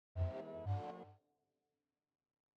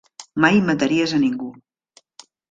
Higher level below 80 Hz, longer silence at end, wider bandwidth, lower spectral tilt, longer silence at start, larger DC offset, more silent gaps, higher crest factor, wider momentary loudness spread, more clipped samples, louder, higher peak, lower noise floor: second, -64 dBFS vs -58 dBFS; first, 1.4 s vs 1 s; second, 5.4 kHz vs 9.2 kHz; first, -9 dB/octave vs -5.5 dB/octave; about the same, 0.15 s vs 0.2 s; neither; neither; about the same, 18 dB vs 20 dB; about the same, 13 LU vs 14 LU; neither; second, -45 LUFS vs -19 LUFS; second, -30 dBFS vs -2 dBFS; first, under -90 dBFS vs -57 dBFS